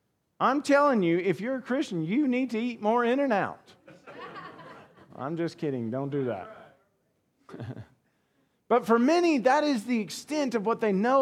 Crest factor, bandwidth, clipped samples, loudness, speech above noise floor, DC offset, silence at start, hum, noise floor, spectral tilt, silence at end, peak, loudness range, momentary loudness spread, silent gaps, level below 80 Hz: 18 dB; 13.5 kHz; under 0.1%; -27 LUFS; 47 dB; under 0.1%; 0.4 s; none; -73 dBFS; -6 dB/octave; 0 s; -10 dBFS; 9 LU; 19 LU; none; -78 dBFS